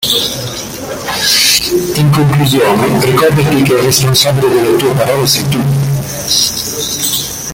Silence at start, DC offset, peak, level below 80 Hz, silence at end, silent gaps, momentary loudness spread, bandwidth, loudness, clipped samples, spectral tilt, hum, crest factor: 0 s; under 0.1%; 0 dBFS; -38 dBFS; 0 s; none; 8 LU; 17.5 kHz; -10 LUFS; under 0.1%; -4 dB/octave; none; 12 dB